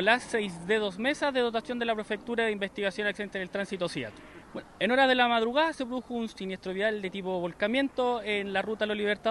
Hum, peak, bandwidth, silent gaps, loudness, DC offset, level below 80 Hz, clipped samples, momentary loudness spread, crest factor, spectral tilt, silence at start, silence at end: none; -8 dBFS; 12 kHz; none; -29 LUFS; under 0.1%; -62 dBFS; under 0.1%; 11 LU; 22 dB; -4.5 dB/octave; 0 s; 0 s